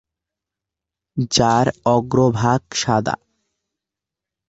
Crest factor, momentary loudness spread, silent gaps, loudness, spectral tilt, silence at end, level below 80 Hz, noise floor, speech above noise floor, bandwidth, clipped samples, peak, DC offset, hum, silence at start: 18 dB; 10 LU; none; -18 LUFS; -5 dB/octave; 1.35 s; -50 dBFS; -86 dBFS; 69 dB; 8.2 kHz; under 0.1%; -2 dBFS; under 0.1%; none; 1.15 s